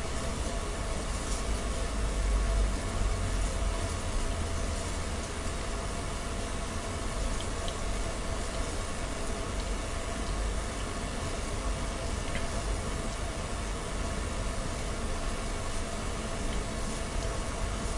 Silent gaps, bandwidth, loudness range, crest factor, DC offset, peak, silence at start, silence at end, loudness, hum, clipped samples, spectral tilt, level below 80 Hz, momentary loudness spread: none; 11.5 kHz; 2 LU; 14 dB; under 0.1%; -18 dBFS; 0 s; 0 s; -34 LUFS; none; under 0.1%; -4 dB/octave; -34 dBFS; 3 LU